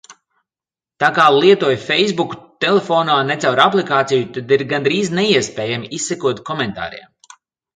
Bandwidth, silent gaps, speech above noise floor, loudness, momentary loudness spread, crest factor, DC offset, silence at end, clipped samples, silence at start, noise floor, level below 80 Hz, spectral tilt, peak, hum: 9.4 kHz; none; over 74 dB; -16 LUFS; 10 LU; 16 dB; under 0.1%; 0.8 s; under 0.1%; 0.1 s; under -90 dBFS; -58 dBFS; -4 dB/octave; 0 dBFS; none